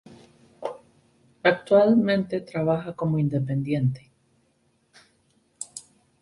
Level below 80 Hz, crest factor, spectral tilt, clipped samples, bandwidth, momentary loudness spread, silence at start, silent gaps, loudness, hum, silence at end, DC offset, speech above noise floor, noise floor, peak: -62 dBFS; 20 dB; -7 dB/octave; under 0.1%; 11.5 kHz; 19 LU; 0.1 s; none; -23 LUFS; none; 0.4 s; under 0.1%; 45 dB; -67 dBFS; -6 dBFS